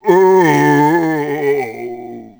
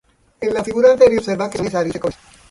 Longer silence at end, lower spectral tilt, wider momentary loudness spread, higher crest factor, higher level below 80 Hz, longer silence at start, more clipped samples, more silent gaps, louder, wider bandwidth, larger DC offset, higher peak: second, 0.1 s vs 0.4 s; about the same, -6.5 dB/octave vs -5.5 dB/octave; first, 17 LU vs 14 LU; about the same, 14 dB vs 16 dB; second, -60 dBFS vs -48 dBFS; second, 0.05 s vs 0.4 s; neither; neither; first, -12 LUFS vs -17 LUFS; first, over 20 kHz vs 11.5 kHz; neither; about the same, 0 dBFS vs 0 dBFS